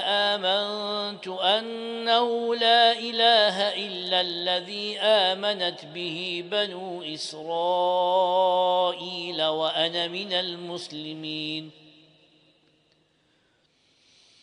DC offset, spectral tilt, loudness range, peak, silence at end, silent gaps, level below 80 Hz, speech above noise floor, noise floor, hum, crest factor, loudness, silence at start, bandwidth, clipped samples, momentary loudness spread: under 0.1%; -3.5 dB/octave; 12 LU; -8 dBFS; 2.7 s; none; -80 dBFS; 41 dB; -67 dBFS; none; 18 dB; -24 LUFS; 0 s; 10.5 kHz; under 0.1%; 13 LU